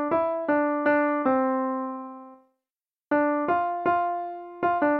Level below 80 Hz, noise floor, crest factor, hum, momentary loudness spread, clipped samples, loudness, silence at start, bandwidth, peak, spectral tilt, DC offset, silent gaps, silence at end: -68 dBFS; under -90 dBFS; 14 dB; none; 12 LU; under 0.1%; -25 LUFS; 0 s; 4.7 kHz; -10 dBFS; -9 dB/octave; under 0.1%; none; 0 s